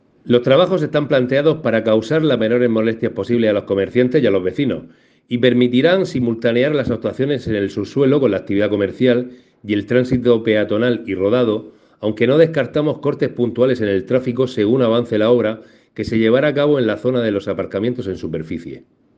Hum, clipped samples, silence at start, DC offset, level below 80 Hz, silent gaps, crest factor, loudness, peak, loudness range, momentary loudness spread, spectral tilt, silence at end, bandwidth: none; under 0.1%; 0.25 s; under 0.1%; -52 dBFS; none; 16 dB; -17 LUFS; 0 dBFS; 2 LU; 8 LU; -7.5 dB/octave; 0.4 s; 7.8 kHz